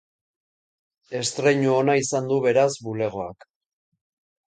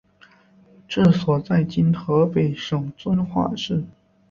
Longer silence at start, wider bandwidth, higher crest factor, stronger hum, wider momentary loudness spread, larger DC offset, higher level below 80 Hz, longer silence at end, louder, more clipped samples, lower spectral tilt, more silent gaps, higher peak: first, 1.1 s vs 0.9 s; first, 9.4 kHz vs 7.2 kHz; about the same, 18 dB vs 18 dB; neither; first, 12 LU vs 9 LU; neither; second, -64 dBFS vs -52 dBFS; first, 1.15 s vs 0.4 s; about the same, -22 LUFS vs -21 LUFS; neither; second, -4.5 dB/octave vs -8 dB/octave; neither; about the same, -6 dBFS vs -4 dBFS